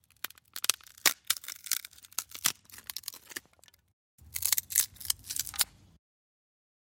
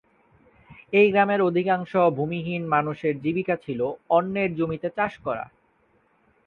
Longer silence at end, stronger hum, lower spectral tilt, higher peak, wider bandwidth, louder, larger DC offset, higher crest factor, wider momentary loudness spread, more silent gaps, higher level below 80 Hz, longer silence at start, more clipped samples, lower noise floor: first, 1.3 s vs 1 s; neither; second, 1.5 dB/octave vs -9 dB/octave; first, -2 dBFS vs -6 dBFS; first, 17 kHz vs 4.8 kHz; second, -31 LUFS vs -24 LUFS; neither; first, 34 dB vs 18 dB; first, 15 LU vs 9 LU; first, 3.93-4.18 s vs none; second, -66 dBFS vs -60 dBFS; second, 0.55 s vs 0.7 s; neither; about the same, -63 dBFS vs -64 dBFS